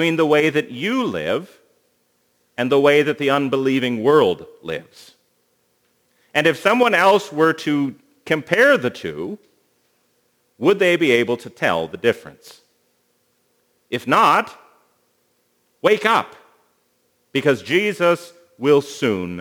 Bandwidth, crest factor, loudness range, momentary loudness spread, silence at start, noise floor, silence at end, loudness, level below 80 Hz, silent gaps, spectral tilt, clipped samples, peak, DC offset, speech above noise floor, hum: over 20 kHz; 20 dB; 4 LU; 14 LU; 0 s; -65 dBFS; 0 s; -18 LUFS; -66 dBFS; none; -5 dB/octave; under 0.1%; 0 dBFS; under 0.1%; 47 dB; none